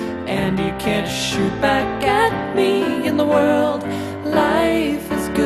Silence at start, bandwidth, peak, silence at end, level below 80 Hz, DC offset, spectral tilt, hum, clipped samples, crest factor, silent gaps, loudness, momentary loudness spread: 0 s; 14 kHz; -2 dBFS; 0 s; -42 dBFS; under 0.1%; -5 dB/octave; none; under 0.1%; 16 dB; none; -19 LUFS; 6 LU